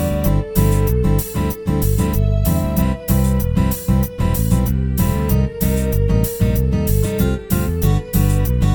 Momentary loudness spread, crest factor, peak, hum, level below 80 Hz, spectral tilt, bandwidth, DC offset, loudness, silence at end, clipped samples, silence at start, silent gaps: 2 LU; 14 dB; -2 dBFS; none; -22 dBFS; -7 dB/octave; 19.5 kHz; 0.1%; -18 LUFS; 0 s; under 0.1%; 0 s; none